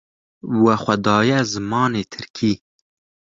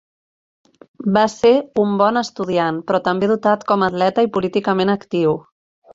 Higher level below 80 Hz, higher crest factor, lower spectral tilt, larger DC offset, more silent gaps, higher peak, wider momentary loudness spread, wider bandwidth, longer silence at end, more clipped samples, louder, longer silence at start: about the same, -54 dBFS vs -58 dBFS; about the same, 18 dB vs 16 dB; about the same, -5.5 dB/octave vs -6 dB/octave; neither; first, 2.30-2.34 s vs none; about the same, -2 dBFS vs -2 dBFS; first, 11 LU vs 5 LU; about the same, 7.6 kHz vs 7.8 kHz; first, 0.8 s vs 0.55 s; neither; about the same, -19 LUFS vs -18 LUFS; second, 0.45 s vs 1 s